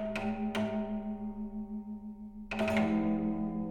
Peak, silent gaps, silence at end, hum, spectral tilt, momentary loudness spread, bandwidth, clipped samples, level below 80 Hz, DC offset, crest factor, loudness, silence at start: -18 dBFS; none; 0 s; none; -7 dB/octave; 13 LU; 10 kHz; under 0.1%; -52 dBFS; under 0.1%; 16 dB; -35 LUFS; 0 s